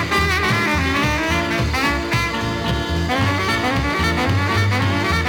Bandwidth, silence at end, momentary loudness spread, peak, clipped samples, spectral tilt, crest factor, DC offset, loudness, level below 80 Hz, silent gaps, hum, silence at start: 19.5 kHz; 0 s; 4 LU; -6 dBFS; under 0.1%; -5 dB/octave; 12 dB; under 0.1%; -18 LUFS; -30 dBFS; none; none; 0 s